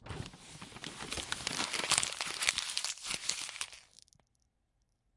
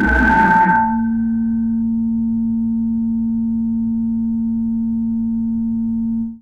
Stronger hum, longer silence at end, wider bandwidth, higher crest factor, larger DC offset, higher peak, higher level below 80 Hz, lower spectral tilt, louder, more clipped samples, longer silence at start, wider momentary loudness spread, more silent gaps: neither; first, 1.35 s vs 0.05 s; first, 11.5 kHz vs 4.7 kHz; first, 32 dB vs 14 dB; second, under 0.1% vs 0.3%; second, -8 dBFS vs -2 dBFS; second, -64 dBFS vs -32 dBFS; second, -0.5 dB/octave vs -8.5 dB/octave; second, -34 LUFS vs -18 LUFS; neither; about the same, 0 s vs 0 s; first, 16 LU vs 7 LU; neither